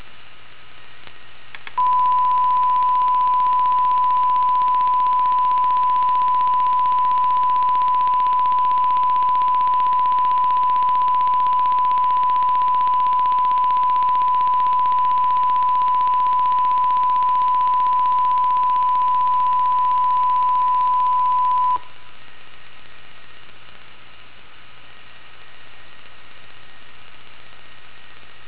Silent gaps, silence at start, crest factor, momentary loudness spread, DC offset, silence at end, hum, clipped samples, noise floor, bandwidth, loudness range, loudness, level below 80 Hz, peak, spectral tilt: none; 0.4 s; 10 dB; 1 LU; 3%; 1.3 s; none; under 0.1%; -46 dBFS; 4 kHz; 3 LU; -17 LUFS; -60 dBFS; -10 dBFS; -6.5 dB/octave